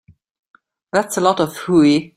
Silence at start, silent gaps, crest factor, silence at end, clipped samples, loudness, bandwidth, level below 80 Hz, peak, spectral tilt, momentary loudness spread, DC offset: 0.95 s; none; 18 dB; 0.1 s; under 0.1%; -16 LUFS; 15.5 kHz; -58 dBFS; 0 dBFS; -5 dB/octave; 7 LU; under 0.1%